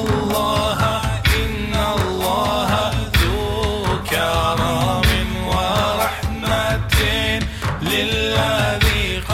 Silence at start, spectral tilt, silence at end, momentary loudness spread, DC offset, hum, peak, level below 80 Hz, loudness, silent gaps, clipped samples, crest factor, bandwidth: 0 s; -4.5 dB/octave; 0 s; 4 LU; under 0.1%; none; -6 dBFS; -26 dBFS; -19 LUFS; none; under 0.1%; 14 dB; 16.5 kHz